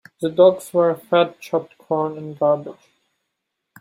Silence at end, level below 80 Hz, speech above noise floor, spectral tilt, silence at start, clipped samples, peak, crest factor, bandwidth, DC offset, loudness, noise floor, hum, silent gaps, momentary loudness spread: 1.1 s; -70 dBFS; 59 dB; -6.5 dB/octave; 0.2 s; under 0.1%; -2 dBFS; 18 dB; 15.5 kHz; under 0.1%; -20 LUFS; -78 dBFS; none; none; 11 LU